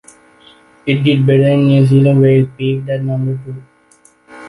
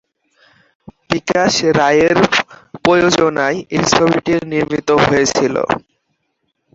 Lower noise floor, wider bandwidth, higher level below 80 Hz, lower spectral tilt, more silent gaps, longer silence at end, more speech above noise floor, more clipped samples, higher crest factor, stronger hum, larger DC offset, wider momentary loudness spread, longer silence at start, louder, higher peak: second, -50 dBFS vs -69 dBFS; first, 11 kHz vs 8 kHz; second, -52 dBFS vs -46 dBFS; first, -8.5 dB/octave vs -4 dB/octave; neither; second, 0 s vs 0.95 s; second, 38 dB vs 55 dB; neither; about the same, 12 dB vs 16 dB; neither; neither; first, 15 LU vs 7 LU; second, 0.85 s vs 1.1 s; about the same, -12 LUFS vs -14 LUFS; about the same, -2 dBFS vs 0 dBFS